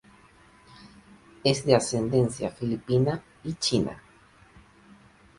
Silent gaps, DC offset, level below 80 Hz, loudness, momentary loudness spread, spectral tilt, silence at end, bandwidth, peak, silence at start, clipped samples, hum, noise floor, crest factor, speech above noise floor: none; under 0.1%; -56 dBFS; -26 LUFS; 11 LU; -5.5 dB/octave; 1.4 s; 11.5 kHz; -4 dBFS; 0.85 s; under 0.1%; none; -56 dBFS; 24 dB; 31 dB